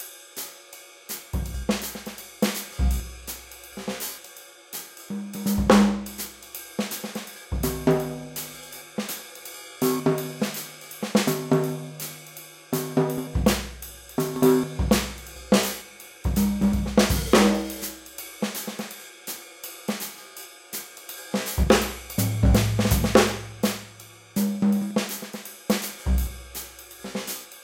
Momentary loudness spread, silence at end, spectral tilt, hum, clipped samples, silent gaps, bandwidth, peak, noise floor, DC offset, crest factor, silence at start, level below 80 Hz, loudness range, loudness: 17 LU; 0 s; -5 dB/octave; none; under 0.1%; none; 17 kHz; -2 dBFS; -47 dBFS; under 0.1%; 24 dB; 0 s; -34 dBFS; 7 LU; -26 LUFS